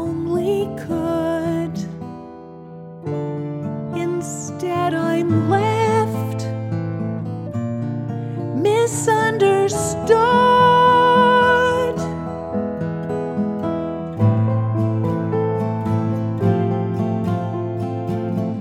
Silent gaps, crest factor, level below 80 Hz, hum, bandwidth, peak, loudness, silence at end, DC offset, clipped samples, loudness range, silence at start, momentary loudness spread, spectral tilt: none; 18 dB; -50 dBFS; none; 14.5 kHz; -2 dBFS; -19 LUFS; 0 s; under 0.1%; under 0.1%; 10 LU; 0 s; 13 LU; -6 dB/octave